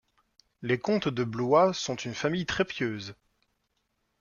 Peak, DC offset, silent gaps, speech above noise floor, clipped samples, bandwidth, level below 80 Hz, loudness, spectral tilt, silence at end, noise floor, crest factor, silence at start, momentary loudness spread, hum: -10 dBFS; under 0.1%; none; 49 dB; under 0.1%; 7.4 kHz; -62 dBFS; -28 LUFS; -5 dB/octave; 1.1 s; -77 dBFS; 20 dB; 0.6 s; 12 LU; none